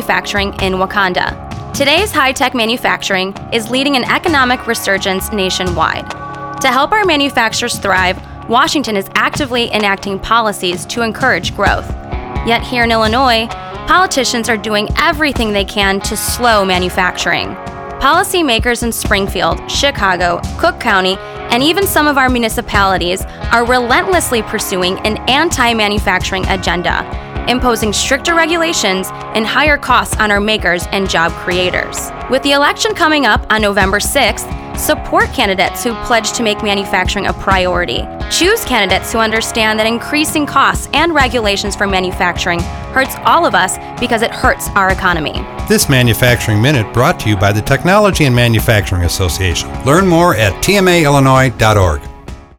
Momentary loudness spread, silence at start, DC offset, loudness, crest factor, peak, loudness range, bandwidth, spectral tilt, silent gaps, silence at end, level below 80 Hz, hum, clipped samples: 7 LU; 0 s; under 0.1%; -12 LUFS; 12 dB; 0 dBFS; 2 LU; 20 kHz; -4 dB/octave; none; 0.15 s; -28 dBFS; none; under 0.1%